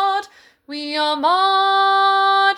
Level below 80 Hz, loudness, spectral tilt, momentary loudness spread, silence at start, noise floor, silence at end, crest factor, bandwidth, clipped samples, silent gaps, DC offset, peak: -70 dBFS; -16 LUFS; -1 dB/octave; 11 LU; 0 s; -42 dBFS; 0 s; 12 dB; 11.5 kHz; under 0.1%; none; under 0.1%; -4 dBFS